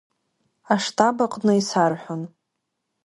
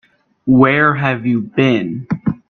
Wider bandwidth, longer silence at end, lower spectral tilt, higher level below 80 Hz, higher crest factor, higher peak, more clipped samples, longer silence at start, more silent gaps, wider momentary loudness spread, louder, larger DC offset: first, 11.5 kHz vs 6.4 kHz; first, 0.8 s vs 0.15 s; second, -5 dB/octave vs -8.5 dB/octave; second, -68 dBFS vs -50 dBFS; first, 20 dB vs 14 dB; about the same, -2 dBFS vs 0 dBFS; neither; first, 0.7 s vs 0.45 s; neither; first, 13 LU vs 10 LU; second, -21 LUFS vs -14 LUFS; neither